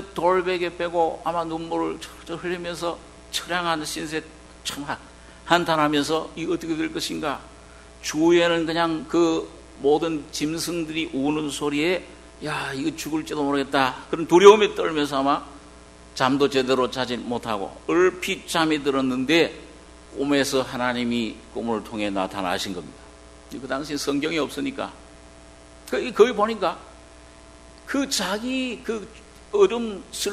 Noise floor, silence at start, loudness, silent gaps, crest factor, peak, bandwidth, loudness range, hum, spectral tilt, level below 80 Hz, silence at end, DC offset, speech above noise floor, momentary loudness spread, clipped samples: -47 dBFS; 0 s; -23 LUFS; none; 24 dB; 0 dBFS; 13 kHz; 8 LU; none; -4 dB/octave; -52 dBFS; 0 s; under 0.1%; 24 dB; 13 LU; under 0.1%